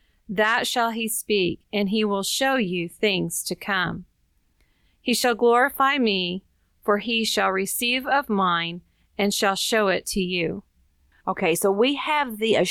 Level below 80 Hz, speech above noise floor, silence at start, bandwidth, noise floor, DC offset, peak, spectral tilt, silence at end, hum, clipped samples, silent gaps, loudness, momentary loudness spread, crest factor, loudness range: -56 dBFS; 43 dB; 0.3 s; 19.5 kHz; -66 dBFS; under 0.1%; -8 dBFS; -3.5 dB/octave; 0 s; none; under 0.1%; none; -23 LUFS; 9 LU; 16 dB; 3 LU